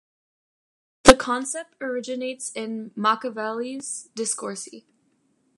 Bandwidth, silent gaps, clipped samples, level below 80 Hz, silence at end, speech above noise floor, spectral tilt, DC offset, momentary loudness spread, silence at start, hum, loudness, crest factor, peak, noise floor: 16 kHz; none; under 0.1%; -44 dBFS; 0.8 s; 39 dB; -2.5 dB/octave; under 0.1%; 17 LU; 1.05 s; none; -23 LUFS; 24 dB; 0 dBFS; -67 dBFS